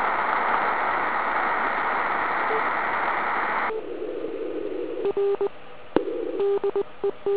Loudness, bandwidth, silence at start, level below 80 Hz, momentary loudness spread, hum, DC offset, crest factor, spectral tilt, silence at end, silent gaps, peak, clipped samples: -25 LUFS; 4 kHz; 0 s; -60 dBFS; 8 LU; none; 1%; 22 dB; -7.5 dB/octave; 0 s; none; -4 dBFS; under 0.1%